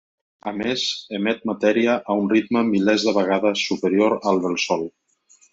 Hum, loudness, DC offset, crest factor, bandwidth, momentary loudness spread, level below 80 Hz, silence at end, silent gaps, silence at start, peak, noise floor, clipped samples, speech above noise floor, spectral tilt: none; -21 LUFS; under 0.1%; 16 dB; 7.8 kHz; 6 LU; -64 dBFS; 0.65 s; none; 0.45 s; -6 dBFS; -57 dBFS; under 0.1%; 37 dB; -4.5 dB/octave